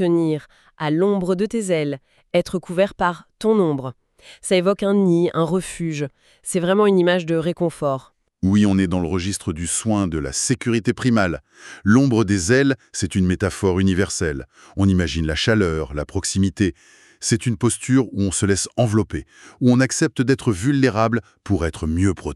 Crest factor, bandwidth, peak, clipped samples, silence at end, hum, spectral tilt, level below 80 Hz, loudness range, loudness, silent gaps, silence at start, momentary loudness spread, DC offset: 16 dB; 13 kHz; -4 dBFS; under 0.1%; 0 s; none; -5.5 dB/octave; -42 dBFS; 2 LU; -20 LUFS; none; 0 s; 9 LU; under 0.1%